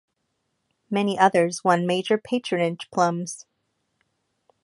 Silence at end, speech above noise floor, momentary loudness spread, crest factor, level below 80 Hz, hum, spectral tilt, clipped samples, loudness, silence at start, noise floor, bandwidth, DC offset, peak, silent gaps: 1.25 s; 53 dB; 10 LU; 22 dB; -72 dBFS; none; -5 dB/octave; under 0.1%; -23 LUFS; 0.9 s; -75 dBFS; 11.5 kHz; under 0.1%; -2 dBFS; none